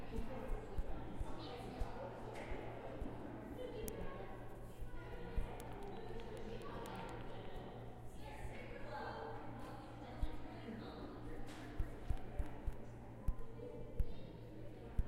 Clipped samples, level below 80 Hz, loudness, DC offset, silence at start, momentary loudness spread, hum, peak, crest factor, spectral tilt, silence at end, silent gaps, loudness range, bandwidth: under 0.1%; -50 dBFS; -50 LUFS; under 0.1%; 0 s; 6 LU; none; -22 dBFS; 22 dB; -6.5 dB/octave; 0 s; none; 1 LU; 16 kHz